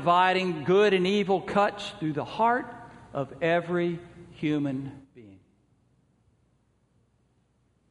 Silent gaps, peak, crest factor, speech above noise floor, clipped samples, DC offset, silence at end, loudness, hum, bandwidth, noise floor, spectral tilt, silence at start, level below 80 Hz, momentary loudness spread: none; -8 dBFS; 20 dB; 43 dB; under 0.1%; under 0.1%; 2.6 s; -26 LUFS; none; 10.5 kHz; -68 dBFS; -6.5 dB/octave; 0 s; -64 dBFS; 16 LU